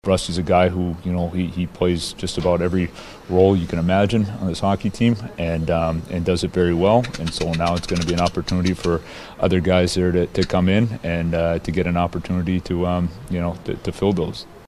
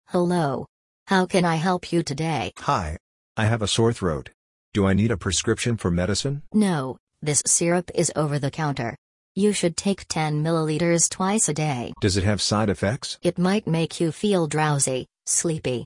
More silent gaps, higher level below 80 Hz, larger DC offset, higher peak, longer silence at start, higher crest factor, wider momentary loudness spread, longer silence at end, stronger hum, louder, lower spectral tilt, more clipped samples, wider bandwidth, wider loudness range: second, none vs 0.69-1.06 s, 3.00-3.35 s, 4.34-4.72 s, 7.00-7.07 s, 8.98-9.35 s; first, -38 dBFS vs -50 dBFS; neither; first, -2 dBFS vs -6 dBFS; about the same, 0.05 s vs 0.1 s; about the same, 18 dB vs 18 dB; about the same, 7 LU vs 7 LU; about the same, 0.05 s vs 0 s; neither; about the same, -21 LUFS vs -23 LUFS; first, -6.5 dB/octave vs -4.5 dB/octave; neither; about the same, 12.5 kHz vs 11.5 kHz; about the same, 2 LU vs 2 LU